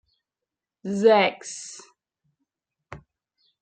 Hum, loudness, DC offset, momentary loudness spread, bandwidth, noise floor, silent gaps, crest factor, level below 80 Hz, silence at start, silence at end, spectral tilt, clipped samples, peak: none; -21 LUFS; under 0.1%; 22 LU; 9.4 kHz; -88 dBFS; none; 22 dB; -66 dBFS; 0.85 s; 0.65 s; -4 dB/octave; under 0.1%; -6 dBFS